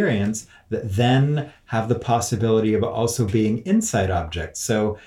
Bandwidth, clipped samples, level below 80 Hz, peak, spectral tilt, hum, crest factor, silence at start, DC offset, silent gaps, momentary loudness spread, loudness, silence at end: 15.5 kHz; under 0.1%; -46 dBFS; -6 dBFS; -5.5 dB/octave; none; 16 dB; 0 s; under 0.1%; none; 8 LU; -22 LUFS; 0.05 s